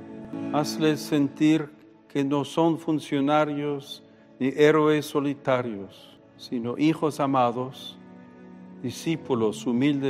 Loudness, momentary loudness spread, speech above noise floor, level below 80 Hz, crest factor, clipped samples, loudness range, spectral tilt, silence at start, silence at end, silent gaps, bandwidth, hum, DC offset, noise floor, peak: -25 LUFS; 16 LU; 22 dB; -72 dBFS; 18 dB; under 0.1%; 4 LU; -6 dB/octave; 0 s; 0 s; none; 15 kHz; none; under 0.1%; -46 dBFS; -6 dBFS